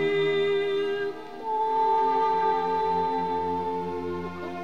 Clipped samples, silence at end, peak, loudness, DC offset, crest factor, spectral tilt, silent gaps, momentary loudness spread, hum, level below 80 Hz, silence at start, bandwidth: under 0.1%; 0 s; -14 dBFS; -26 LUFS; 0.5%; 12 dB; -6 dB/octave; none; 10 LU; none; -64 dBFS; 0 s; 9.2 kHz